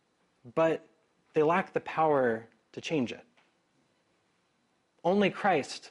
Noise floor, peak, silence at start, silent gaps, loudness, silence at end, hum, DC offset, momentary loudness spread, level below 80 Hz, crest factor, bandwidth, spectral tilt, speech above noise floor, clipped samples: -73 dBFS; -14 dBFS; 0.45 s; none; -29 LUFS; 0 s; none; under 0.1%; 11 LU; -74 dBFS; 18 dB; 11.5 kHz; -6 dB/octave; 45 dB; under 0.1%